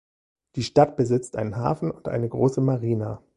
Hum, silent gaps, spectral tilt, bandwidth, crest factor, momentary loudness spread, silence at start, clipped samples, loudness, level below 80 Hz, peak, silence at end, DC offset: none; none; -7.5 dB/octave; 11 kHz; 20 dB; 9 LU; 0.55 s; under 0.1%; -24 LUFS; -54 dBFS; -4 dBFS; 0.2 s; under 0.1%